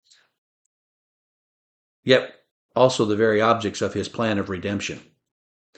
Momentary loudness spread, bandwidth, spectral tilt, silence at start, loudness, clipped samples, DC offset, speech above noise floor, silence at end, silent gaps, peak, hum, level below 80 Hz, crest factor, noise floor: 13 LU; 9 kHz; -5 dB/octave; 2.05 s; -22 LUFS; under 0.1%; under 0.1%; over 69 dB; 0.8 s; 2.51-2.69 s; -2 dBFS; none; -62 dBFS; 22 dB; under -90 dBFS